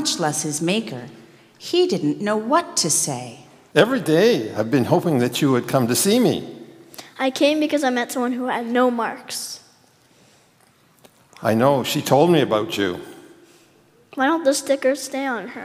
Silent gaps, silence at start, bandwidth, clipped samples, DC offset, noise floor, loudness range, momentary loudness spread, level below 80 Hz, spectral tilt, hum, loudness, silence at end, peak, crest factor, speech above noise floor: none; 0 s; 16 kHz; under 0.1%; under 0.1%; -57 dBFS; 5 LU; 16 LU; -70 dBFS; -4 dB/octave; none; -20 LUFS; 0 s; 0 dBFS; 20 dB; 37 dB